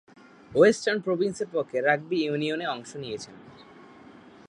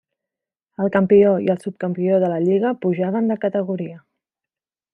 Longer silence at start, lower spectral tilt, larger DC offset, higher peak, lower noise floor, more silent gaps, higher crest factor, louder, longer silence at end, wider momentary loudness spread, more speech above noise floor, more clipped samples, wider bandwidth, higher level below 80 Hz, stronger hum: second, 0.5 s vs 0.8 s; second, -5 dB/octave vs -9.5 dB/octave; neither; about the same, -6 dBFS vs -4 dBFS; second, -50 dBFS vs -89 dBFS; neither; about the same, 20 dB vs 16 dB; second, -26 LUFS vs -19 LUFS; about the same, 0.95 s vs 0.95 s; first, 16 LU vs 12 LU; second, 24 dB vs 71 dB; neither; about the same, 11 kHz vs 11 kHz; about the same, -68 dBFS vs -66 dBFS; neither